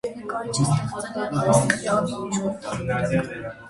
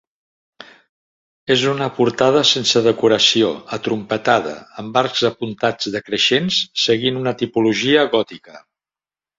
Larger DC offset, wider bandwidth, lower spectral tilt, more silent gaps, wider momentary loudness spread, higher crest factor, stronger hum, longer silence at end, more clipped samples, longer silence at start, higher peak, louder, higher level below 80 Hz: neither; first, 11.5 kHz vs 7.8 kHz; about the same, -5 dB/octave vs -4 dB/octave; second, none vs 0.89-1.46 s; about the same, 10 LU vs 9 LU; about the same, 22 dB vs 18 dB; neither; second, 0 s vs 0.8 s; neither; second, 0.05 s vs 0.6 s; about the same, -2 dBFS vs -2 dBFS; second, -24 LUFS vs -17 LUFS; first, -50 dBFS vs -58 dBFS